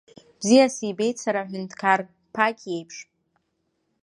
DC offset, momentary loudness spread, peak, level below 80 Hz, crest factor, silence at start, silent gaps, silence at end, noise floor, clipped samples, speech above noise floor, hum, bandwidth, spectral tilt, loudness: under 0.1%; 16 LU; -4 dBFS; -74 dBFS; 22 dB; 0.4 s; none; 1 s; -74 dBFS; under 0.1%; 51 dB; none; 11.5 kHz; -4 dB/octave; -23 LUFS